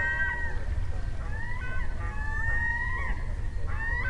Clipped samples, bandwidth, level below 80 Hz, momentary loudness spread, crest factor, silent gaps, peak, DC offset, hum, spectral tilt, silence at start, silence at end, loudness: under 0.1%; 9.8 kHz; -32 dBFS; 8 LU; 12 dB; none; -16 dBFS; under 0.1%; none; -6 dB/octave; 0 s; 0 s; -32 LUFS